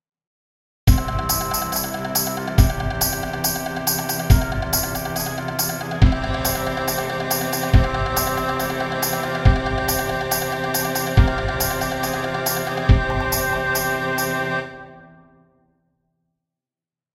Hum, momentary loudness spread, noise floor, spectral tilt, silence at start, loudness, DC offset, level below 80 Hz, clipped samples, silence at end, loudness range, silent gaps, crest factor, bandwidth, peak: none; 5 LU; under -90 dBFS; -4 dB/octave; 0.85 s; -21 LUFS; under 0.1%; -26 dBFS; under 0.1%; 2.05 s; 2 LU; none; 22 dB; 16.5 kHz; 0 dBFS